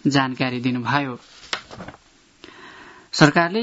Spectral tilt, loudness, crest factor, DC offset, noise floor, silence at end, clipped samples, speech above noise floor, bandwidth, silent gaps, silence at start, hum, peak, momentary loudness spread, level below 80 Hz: -5 dB/octave; -21 LUFS; 22 dB; under 0.1%; -49 dBFS; 0 s; under 0.1%; 28 dB; 8 kHz; none; 0.05 s; none; 0 dBFS; 26 LU; -58 dBFS